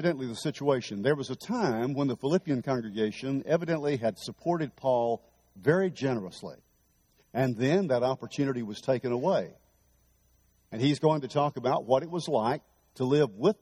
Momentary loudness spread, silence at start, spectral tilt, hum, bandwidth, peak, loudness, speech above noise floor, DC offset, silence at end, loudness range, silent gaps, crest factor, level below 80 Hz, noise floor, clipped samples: 8 LU; 0 s; -6.5 dB/octave; none; 14 kHz; -10 dBFS; -29 LUFS; 40 dB; under 0.1%; 0.1 s; 1 LU; none; 20 dB; -68 dBFS; -68 dBFS; under 0.1%